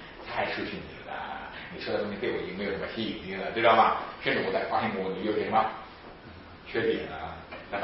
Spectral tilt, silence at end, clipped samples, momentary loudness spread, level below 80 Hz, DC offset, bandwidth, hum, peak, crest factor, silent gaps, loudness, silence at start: -9 dB/octave; 0 s; under 0.1%; 17 LU; -56 dBFS; under 0.1%; 5.8 kHz; none; -8 dBFS; 22 dB; none; -29 LUFS; 0 s